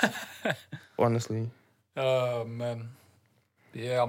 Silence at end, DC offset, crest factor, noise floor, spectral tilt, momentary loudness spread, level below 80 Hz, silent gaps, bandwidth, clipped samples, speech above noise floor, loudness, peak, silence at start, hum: 0 s; under 0.1%; 22 dB; -67 dBFS; -5.5 dB/octave; 15 LU; -78 dBFS; none; 16.5 kHz; under 0.1%; 38 dB; -32 LUFS; -8 dBFS; 0 s; none